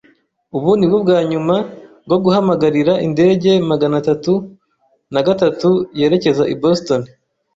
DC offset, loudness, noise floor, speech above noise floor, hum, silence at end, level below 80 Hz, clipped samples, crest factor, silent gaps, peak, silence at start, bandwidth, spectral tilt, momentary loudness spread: under 0.1%; -15 LUFS; -61 dBFS; 47 dB; none; 0.5 s; -54 dBFS; under 0.1%; 14 dB; none; -2 dBFS; 0.55 s; 7.8 kHz; -7 dB/octave; 7 LU